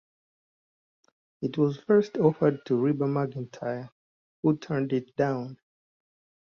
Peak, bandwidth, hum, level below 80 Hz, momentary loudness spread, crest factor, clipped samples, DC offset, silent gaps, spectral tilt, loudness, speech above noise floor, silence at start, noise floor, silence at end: -8 dBFS; 6.8 kHz; none; -68 dBFS; 12 LU; 20 dB; under 0.1%; under 0.1%; 3.92-4.43 s; -9 dB/octave; -27 LUFS; over 64 dB; 1.4 s; under -90 dBFS; 0.95 s